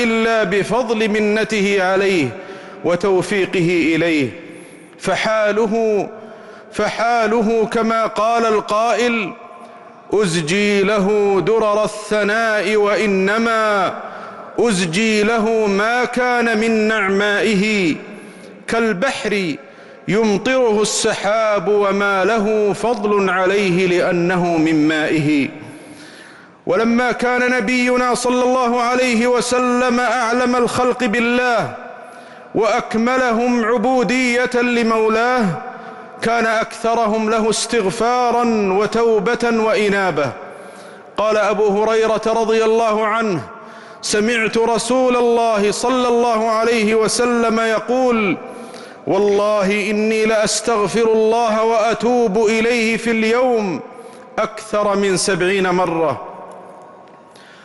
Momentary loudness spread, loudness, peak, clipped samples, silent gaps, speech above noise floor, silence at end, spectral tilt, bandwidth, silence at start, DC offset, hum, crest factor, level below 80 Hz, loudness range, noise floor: 11 LU; -16 LUFS; -8 dBFS; under 0.1%; none; 26 dB; 0.15 s; -4.5 dB/octave; 11.5 kHz; 0 s; under 0.1%; none; 10 dB; -50 dBFS; 2 LU; -42 dBFS